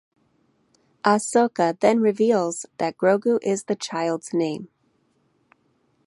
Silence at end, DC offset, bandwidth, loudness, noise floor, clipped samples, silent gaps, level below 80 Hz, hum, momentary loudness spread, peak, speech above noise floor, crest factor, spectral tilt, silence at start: 1.4 s; under 0.1%; 11.5 kHz; -22 LUFS; -66 dBFS; under 0.1%; none; -74 dBFS; none; 8 LU; -2 dBFS; 45 dB; 22 dB; -5 dB/octave; 1.05 s